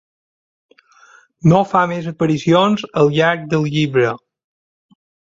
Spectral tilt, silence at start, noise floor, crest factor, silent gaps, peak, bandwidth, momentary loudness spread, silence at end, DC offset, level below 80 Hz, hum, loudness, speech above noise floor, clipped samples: -7 dB/octave; 1.45 s; -49 dBFS; 16 dB; none; -2 dBFS; 7.6 kHz; 6 LU; 1.2 s; under 0.1%; -52 dBFS; none; -16 LUFS; 34 dB; under 0.1%